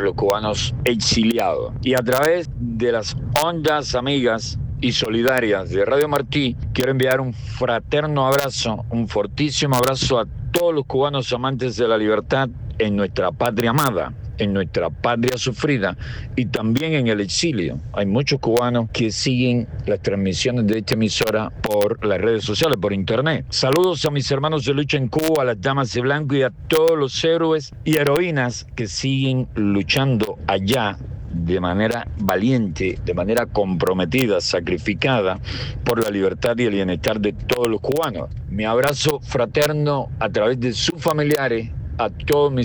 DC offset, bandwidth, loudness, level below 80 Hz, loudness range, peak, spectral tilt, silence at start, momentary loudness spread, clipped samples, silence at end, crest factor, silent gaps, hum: under 0.1%; over 20 kHz; -20 LUFS; -38 dBFS; 2 LU; -2 dBFS; -5 dB/octave; 0 s; 6 LU; under 0.1%; 0 s; 18 dB; none; none